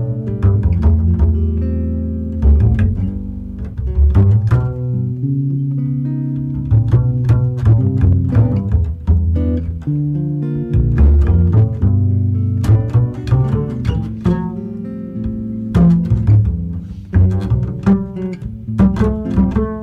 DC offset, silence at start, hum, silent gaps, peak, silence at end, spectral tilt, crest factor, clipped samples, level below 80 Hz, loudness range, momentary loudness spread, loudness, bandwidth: under 0.1%; 0 s; none; none; -4 dBFS; 0 s; -10.5 dB/octave; 10 dB; under 0.1%; -22 dBFS; 2 LU; 11 LU; -16 LUFS; 4.5 kHz